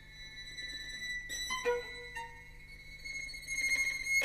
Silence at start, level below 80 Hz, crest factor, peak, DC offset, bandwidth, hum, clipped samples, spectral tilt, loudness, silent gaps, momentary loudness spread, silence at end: 0 s; -56 dBFS; 18 dB; -22 dBFS; under 0.1%; 14 kHz; 50 Hz at -60 dBFS; under 0.1%; -0.5 dB/octave; -36 LUFS; none; 18 LU; 0 s